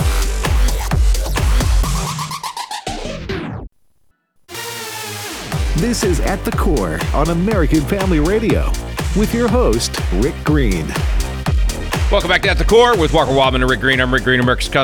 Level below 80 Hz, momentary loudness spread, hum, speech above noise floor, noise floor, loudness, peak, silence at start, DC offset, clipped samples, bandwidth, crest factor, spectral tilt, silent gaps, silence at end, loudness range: -20 dBFS; 11 LU; none; 44 dB; -59 dBFS; -17 LUFS; -2 dBFS; 0 s; under 0.1%; under 0.1%; 19.5 kHz; 14 dB; -5 dB/octave; none; 0 s; 10 LU